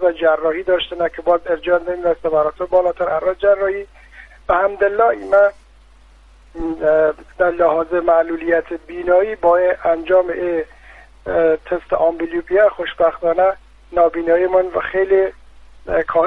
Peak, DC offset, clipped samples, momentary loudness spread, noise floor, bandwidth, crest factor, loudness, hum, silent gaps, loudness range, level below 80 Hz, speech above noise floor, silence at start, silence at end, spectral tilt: -4 dBFS; under 0.1%; under 0.1%; 7 LU; -46 dBFS; 4.9 kHz; 14 dB; -17 LUFS; none; none; 2 LU; -44 dBFS; 30 dB; 0 s; 0 s; -7 dB/octave